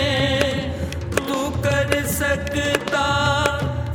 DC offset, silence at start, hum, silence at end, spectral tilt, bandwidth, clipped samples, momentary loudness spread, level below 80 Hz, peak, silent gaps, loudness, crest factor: under 0.1%; 0 s; none; 0 s; -4.5 dB/octave; 18 kHz; under 0.1%; 6 LU; -36 dBFS; 0 dBFS; none; -21 LUFS; 20 dB